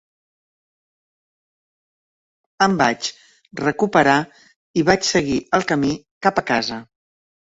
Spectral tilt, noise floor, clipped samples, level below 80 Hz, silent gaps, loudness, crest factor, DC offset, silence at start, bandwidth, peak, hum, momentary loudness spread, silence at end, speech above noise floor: -4.5 dB/octave; under -90 dBFS; under 0.1%; -54 dBFS; 4.56-4.74 s, 6.11-6.21 s; -19 LUFS; 20 dB; under 0.1%; 2.6 s; 8 kHz; -2 dBFS; none; 11 LU; 0.75 s; over 71 dB